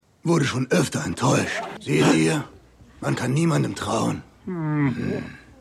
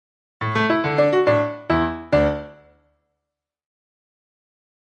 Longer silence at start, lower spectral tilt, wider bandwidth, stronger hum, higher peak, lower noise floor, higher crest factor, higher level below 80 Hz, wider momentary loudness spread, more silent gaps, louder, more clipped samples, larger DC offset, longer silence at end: second, 0.25 s vs 0.4 s; second, -5.5 dB/octave vs -7.5 dB/octave; first, 13.5 kHz vs 8.2 kHz; neither; about the same, -6 dBFS vs -4 dBFS; second, -44 dBFS vs -83 dBFS; about the same, 18 dB vs 18 dB; second, -54 dBFS vs -46 dBFS; first, 12 LU vs 7 LU; neither; second, -23 LUFS vs -20 LUFS; neither; neither; second, 0.25 s vs 2.45 s